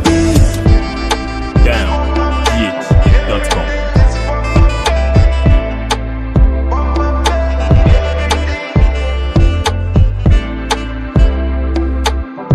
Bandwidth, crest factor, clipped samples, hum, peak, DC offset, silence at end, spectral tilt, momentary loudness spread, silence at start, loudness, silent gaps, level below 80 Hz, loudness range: 12.5 kHz; 12 dB; under 0.1%; none; 0 dBFS; under 0.1%; 0 s; -6 dB/octave; 6 LU; 0 s; -14 LUFS; none; -14 dBFS; 2 LU